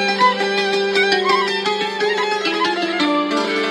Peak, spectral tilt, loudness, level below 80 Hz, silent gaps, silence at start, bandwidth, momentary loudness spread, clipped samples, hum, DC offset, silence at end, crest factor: 0 dBFS; -3 dB/octave; -17 LUFS; -64 dBFS; none; 0 s; 13 kHz; 4 LU; under 0.1%; none; under 0.1%; 0 s; 18 dB